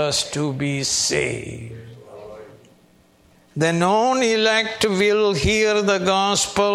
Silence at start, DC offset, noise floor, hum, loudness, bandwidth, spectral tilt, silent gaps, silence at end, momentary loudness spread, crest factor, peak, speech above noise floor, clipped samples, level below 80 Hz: 0 s; under 0.1%; -55 dBFS; none; -19 LUFS; 14.5 kHz; -3.5 dB/octave; none; 0 s; 19 LU; 16 dB; -4 dBFS; 35 dB; under 0.1%; -44 dBFS